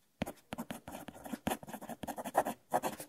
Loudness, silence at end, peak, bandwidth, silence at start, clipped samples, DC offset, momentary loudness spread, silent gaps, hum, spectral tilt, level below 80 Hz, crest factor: -40 LUFS; 0 s; -16 dBFS; 16 kHz; 0.2 s; under 0.1%; under 0.1%; 11 LU; none; none; -4.5 dB/octave; -64 dBFS; 24 dB